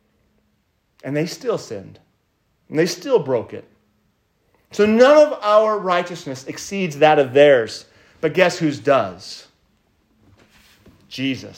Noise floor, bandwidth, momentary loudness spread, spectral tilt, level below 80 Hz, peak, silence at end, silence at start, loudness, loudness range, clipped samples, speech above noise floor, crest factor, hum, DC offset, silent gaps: -66 dBFS; 16 kHz; 22 LU; -5 dB/octave; -64 dBFS; 0 dBFS; 0.05 s; 1.05 s; -17 LUFS; 9 LU; under 0.1%; 49 dB; 20 dB; none; under 0.1%; none